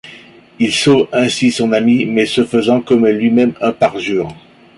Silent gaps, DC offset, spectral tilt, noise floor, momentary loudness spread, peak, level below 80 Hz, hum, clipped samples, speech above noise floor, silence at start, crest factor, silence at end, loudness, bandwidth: none; under 0.1%; -5 dB/octave; -40 dBFS; 7 LU; -2 dBFS; -52 dBFS; none; under 0.1%; 27 dB; 0.05 s; 12 dB; 0.4 s; -13 LUFS; 11.5 kHz